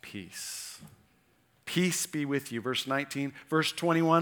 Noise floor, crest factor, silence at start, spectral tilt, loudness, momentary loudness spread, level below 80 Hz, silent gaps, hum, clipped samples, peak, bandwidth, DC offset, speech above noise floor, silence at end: -68 dBFS; 22 dB; 0.05 s; -4 dB/octave; -31 LUFS; 14 LU; -76 dBFS; none; none; under 0.1%; -10 dBFS; over 20 kHz; under 0.1%; 38 dB; 0 s